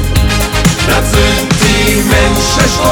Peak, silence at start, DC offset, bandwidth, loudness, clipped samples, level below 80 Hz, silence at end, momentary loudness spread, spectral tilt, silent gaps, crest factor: 0 dBFS; 0 s; under 0.1%; 18.5 kHz; -10 LUFS; under 0.1%; -16 dBFS; 0 s; 2 LU; -4 dB/octave; none; 10 dB